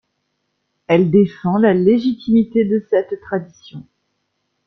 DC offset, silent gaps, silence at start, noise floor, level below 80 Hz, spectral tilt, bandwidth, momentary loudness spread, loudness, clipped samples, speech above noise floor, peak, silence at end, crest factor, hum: under 0.1%; none; 0.9 s; -71 dBFS; -56 dBFS; -9 dB/octave; 6.2 kHz; 12 LU; -16 LUFS; under 0.1%; 55 dB; -2 dBFS; 0.85 s; 16 dB; none